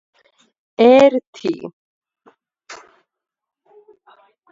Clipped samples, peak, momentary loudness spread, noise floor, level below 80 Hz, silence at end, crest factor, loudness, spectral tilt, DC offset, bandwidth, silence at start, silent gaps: under 0.1%; 0 dBFS; 29 LU; -56 dBFS; -64 dBFS; 1.75 s; 20 dB; -14 LUFS; -5.5 dB/octave; under 0.1%; 7.8 kHz; 0.8 s; 1.27-1.33 s, 1.73-2.01 s